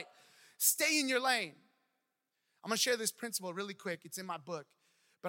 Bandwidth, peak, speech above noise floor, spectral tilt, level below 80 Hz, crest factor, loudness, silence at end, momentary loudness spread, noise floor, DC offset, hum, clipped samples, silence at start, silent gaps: 17 kHz; -14 dBFS; 49 dB; -1 dB/octave; under -90 dBFS; 24 dB; -34 LUFS; 0 s; 15 LU; -85 dBFS; under 0.1%; none; under 0.1%; 0 s; none